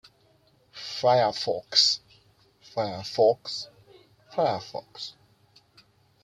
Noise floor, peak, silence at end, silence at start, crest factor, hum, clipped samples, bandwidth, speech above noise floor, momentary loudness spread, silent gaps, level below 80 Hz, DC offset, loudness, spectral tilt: -63 dBFS; -6 dBFS; 1.15 s; 0.75 s; 22 dB; none; under 0.1%; 12.5 kHz; 38 dB; 19 LU; none; -70 dBFS; under 0.1%; -25 LUFS; -3 dB/octave